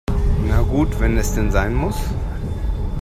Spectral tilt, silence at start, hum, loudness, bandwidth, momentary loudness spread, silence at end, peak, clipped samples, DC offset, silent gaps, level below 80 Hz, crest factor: -6.5 dB/octave; 0.1 s; none; -21 LUFS; 15 kHz; 7 LU; 0 s; -2 dBFS; under 0.1%; under 0.1%; none; -20 dBFS; 16 dB